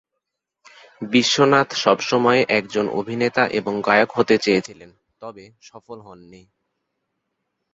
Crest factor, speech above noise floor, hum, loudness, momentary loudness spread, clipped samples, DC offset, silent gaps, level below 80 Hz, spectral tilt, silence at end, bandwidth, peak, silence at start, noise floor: 20 dB; 60 dB; none; -18 LUFS; 23 LU; under 0.1%; under 0.1%; none; -62 dBFS; -4 dB/octave; 1.4 s; 8 kHz; -2 dBFS; 1 s; -80 dBFS